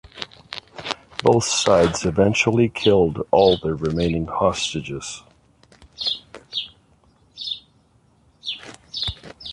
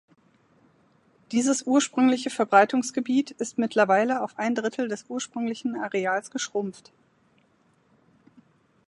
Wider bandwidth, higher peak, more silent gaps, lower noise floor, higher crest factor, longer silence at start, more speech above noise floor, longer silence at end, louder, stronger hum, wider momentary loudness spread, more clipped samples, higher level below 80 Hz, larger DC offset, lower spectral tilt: about the same, 11.5 kHz vs 11.5 kHz; about the same, -2 dBFS vs -2 dBFS; neither; second, -58 dBFS vs -64 dBFS; about the same, 20 dB vs 24 dB; second, 0.15 s vs 1.3 s; about the same, 39 dB vs 40 dB; second, 0 s vs 2.15 s; first, -21 LUFS vs -25 LUFS; neither; first, 17 LU vs 10 LU; neither; first, -44 dBFS vs -78 dBFS; neither; about the same, -4.5 dB/octave vs -3.5 dB/octave